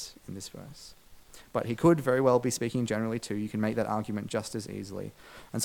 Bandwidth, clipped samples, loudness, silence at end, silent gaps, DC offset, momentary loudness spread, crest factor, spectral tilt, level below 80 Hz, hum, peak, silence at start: 18 kHz; under 0.1%; -29 LUFS; 0 s; none; under 0.1%; 20 LU; 20 dB; -5.5 dB/octave; -60 dBFS; none; -10 dBFS; 0 s